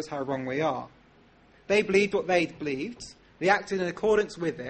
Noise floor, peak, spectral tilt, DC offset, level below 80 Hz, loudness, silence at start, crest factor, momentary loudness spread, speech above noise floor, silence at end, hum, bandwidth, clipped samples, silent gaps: -58 dBFS; -10 dBFS; -5 dB/octave; under 0.1%; -60 dBFS; -27 LUFS; 0 s; 18 dB; 13 LU; 31 dB; 0 s; none; 8.8 kHz; under 0.1%; none